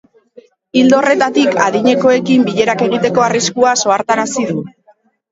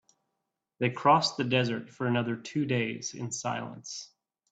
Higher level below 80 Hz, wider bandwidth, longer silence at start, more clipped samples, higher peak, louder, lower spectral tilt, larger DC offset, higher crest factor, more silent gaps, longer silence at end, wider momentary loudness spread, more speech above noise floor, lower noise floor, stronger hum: first, -56 dBFS vs -72 dBFS; second, 8 kHz vs 9.2 kHz; about the same, 0.75 s vs 0.8 s; neither; first, 0 dBFS vs -8 dBFS; first, -12 LUFS vs -29 LUFS; about the same, -4 dB/octave vs -4.5 dB/octave; neither; second, 14 dB vs 22 dB; neither; first, 0.6 s vs 0.45 s; second, 7 LU vs 15 LU; second, 40 dB vs 55 dB; second, -52 dBFS vs -84 dBFS; neither